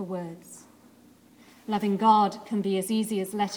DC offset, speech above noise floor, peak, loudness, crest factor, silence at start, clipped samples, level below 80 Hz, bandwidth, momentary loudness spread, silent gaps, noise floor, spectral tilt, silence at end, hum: under 0.1%; 30 dB; -8 dBFS; -26 LUFS; 20 dB; 0 s; under 0.1%; -74 dBFS; 19.5 kHz; 22 LU; none; -56 dBFS; -5.5 dB/octave; 0 s; none